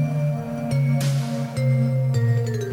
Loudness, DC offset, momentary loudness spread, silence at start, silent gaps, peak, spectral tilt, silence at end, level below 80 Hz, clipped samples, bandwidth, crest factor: -22 LUFS; under 0.1%; 4 LU; 0 s; none; -10 dBFS; -7.5 dB/octave; 0 s; -54 dBFS; under 0.1%; 15.5 kHz; 10 dB